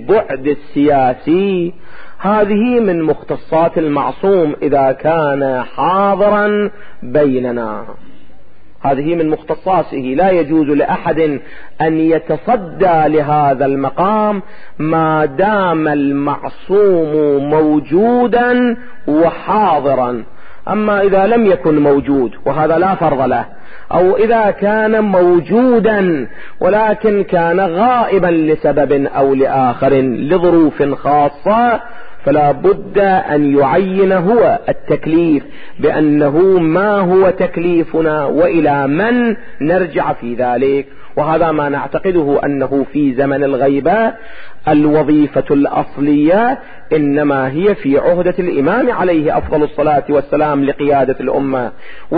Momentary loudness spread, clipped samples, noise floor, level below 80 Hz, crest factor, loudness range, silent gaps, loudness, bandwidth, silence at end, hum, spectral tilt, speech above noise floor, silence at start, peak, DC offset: 7 LU; under 0.1%; -42 dBFS; -42 dBFS; 10 dB; 3 LU; none; -13 LUFS; 4.9 kHz; 0 s; none; -12.5 dB/octave; 30 dB; 0 s; -2 dBFS; under 0.1%